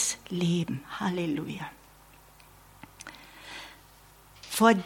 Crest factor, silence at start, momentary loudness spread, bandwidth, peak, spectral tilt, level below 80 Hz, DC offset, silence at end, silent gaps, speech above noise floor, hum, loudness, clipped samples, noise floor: 26 dB; 0 s; 22 LU; 17.5 kHz; -6 dBFS; -4.5 dB/octave; -62 dBFS; under 0.1%; 0 s; none; 28 dB; none; -30 LUFS; under 0.1%; -55 dBFS